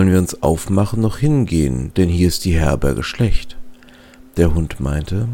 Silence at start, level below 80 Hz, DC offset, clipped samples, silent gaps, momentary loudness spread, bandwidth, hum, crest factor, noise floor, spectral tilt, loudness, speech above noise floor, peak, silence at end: 0 s; -26 dBFS; under 0.1%; under 0.1%; none; 6 LU; 17 kHz; none; 16 dB; -43 dBFS; -6.5 dB/octave; -18 LUFS; 27 dB; 0 dBFS; 0 s